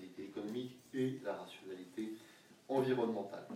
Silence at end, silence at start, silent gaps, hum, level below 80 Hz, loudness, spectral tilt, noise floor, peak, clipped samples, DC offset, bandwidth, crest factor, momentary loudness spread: 0 s; 0 s; none; none; -86 dBFS; -41 LUFS; -6.5 dB/octave; -62 dBFS; -22 dBFS; under 0.1%; under 0.1%; 16 kHz; 18 dB; 14 LU